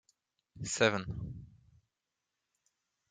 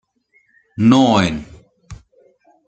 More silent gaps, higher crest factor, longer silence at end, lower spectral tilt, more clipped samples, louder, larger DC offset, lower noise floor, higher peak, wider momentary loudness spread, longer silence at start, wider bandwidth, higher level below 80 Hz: neither; first, 28 dB vs 18 dB; first, 1.65 s vs 0.7 s; second, -3.5 dB/octave vs -6 dB/octave; neither; second, -33 LUFS vs -14 LUFS; neither; first, -88 dBFS vs -60 dBFS; second, -12 dBFS vs -2 dBFS; about the same, 17 LU vs 19 LU; second, 0.55 s vs 0.8 s; about the same, 9.6 kHz vs 9 kHz; second, -60 dBFS vs -48 dBFS